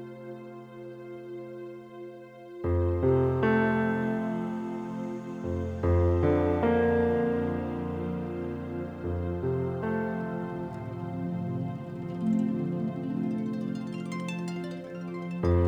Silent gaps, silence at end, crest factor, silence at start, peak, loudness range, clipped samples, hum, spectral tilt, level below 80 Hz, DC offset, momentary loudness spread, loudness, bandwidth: none; 0 s; 18 dB; 0 s; -12 dBFS; 5 LU; under 0.1%; none; -9 dB/octave; -46 dBFS; under 0.1%; 17 LU; -30 LUFS; 9.2 kHz